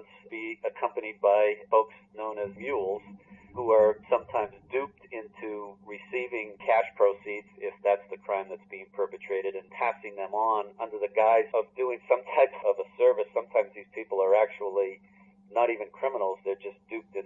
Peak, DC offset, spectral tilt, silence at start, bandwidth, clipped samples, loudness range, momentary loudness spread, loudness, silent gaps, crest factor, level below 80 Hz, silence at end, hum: -8 dBFS; under 0.1%; -6.5 dB/octave; 0.3 s; 4 kHz; under 0.1%; 5 LU; 15 LU; -29 LUFS; none; 20 dB; -74 dBFS; 0.05 s; none